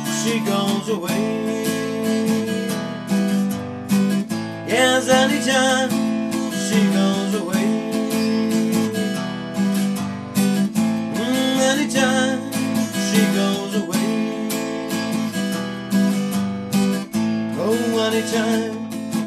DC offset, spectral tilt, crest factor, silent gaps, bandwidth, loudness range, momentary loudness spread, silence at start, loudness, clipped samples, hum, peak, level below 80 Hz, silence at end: under 0.1%; -4.5 dB/octave; 18 dB; none; 14 kHz; 4 LU; 7 LU; 0 s; -20 LUFS; under 0.1%; none; -2 dBFS; -62 dBFS; 0 s